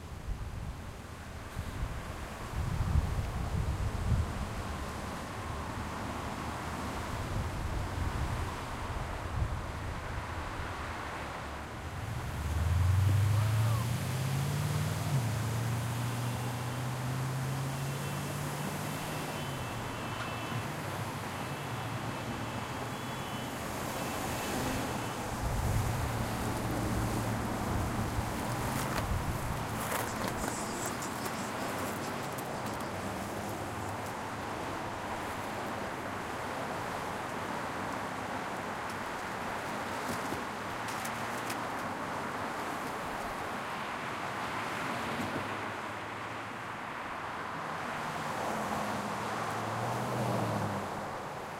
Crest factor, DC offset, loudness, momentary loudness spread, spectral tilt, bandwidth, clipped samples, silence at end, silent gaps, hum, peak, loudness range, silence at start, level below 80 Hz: 18 dB; under 0.1%; -36 LUFS; 6 LU; -5 dB/octave; 16 kHz; under 0.1%; 0 s; none; none; -16 dBFS; 5 LU; 0 s; -44 dBFS